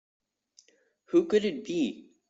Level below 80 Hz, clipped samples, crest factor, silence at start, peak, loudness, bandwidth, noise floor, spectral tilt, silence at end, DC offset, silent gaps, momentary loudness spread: -72 dBFS; under 0.1%; 18 dB; 1.1 s; -12 dBFS; -28 LUFS; 8 kHz; -66 dBFS; -5.5 dB/octave; 0.3 s; under 0.1%; none; 7 LU